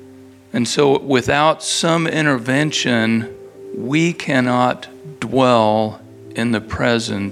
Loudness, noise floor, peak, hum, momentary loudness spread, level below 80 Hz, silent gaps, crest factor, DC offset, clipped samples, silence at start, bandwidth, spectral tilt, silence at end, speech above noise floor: -17 LUFS; -42 dBFS; 0 dBFS; none; 14 LU; -50 dBFS; none; 18 dB; under 0.1%; under 0.1%; 0 s; 14 kHz; -4.5 dB/octave; 0 s; 25 dB